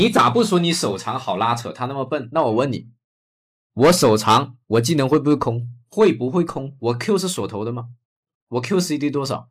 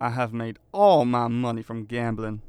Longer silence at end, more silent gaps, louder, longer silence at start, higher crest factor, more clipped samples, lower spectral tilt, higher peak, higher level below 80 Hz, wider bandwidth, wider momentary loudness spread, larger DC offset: about the same, 0.1 s vs 0.1 s; first, 3.04-3.70 s, 8.05-8.23 s, 8.35-8.47 s vs none; first, -20 LUFS vs -24 LUFS; about the same, 0 s vs 0 s; about the same, 14 dB vs 16 dB; neither; second, -5 dB/octave vs -7.5 dB/octave; about the same, -6 dBFS vs -6 dBFS; about the same, -56 dBFS vs -52 dBFS; first, 16 kHz vs 11 kHz; about the same, 12 LU vs 14 LU; neither